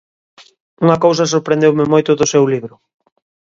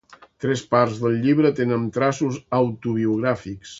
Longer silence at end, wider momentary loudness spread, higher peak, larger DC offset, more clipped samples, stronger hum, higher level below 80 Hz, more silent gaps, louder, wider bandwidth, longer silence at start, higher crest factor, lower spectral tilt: first, 0.9 s vs 0 s; about the same, 5 LU vs 7 LU; about the same, 0 dBFS vs -2 dBFS; neither; neither; neither; about the same, -56 dBFS vs -58 dBFS; neither; first, -13 LUFS vs -22 LUFS; about the same, 7.8 kHz vs 8 kHz; first, 0.8 s vs 0.1 s; second, 14 dB vs 20 dB; second, -5.5 dB/octave vs -7 dB/octave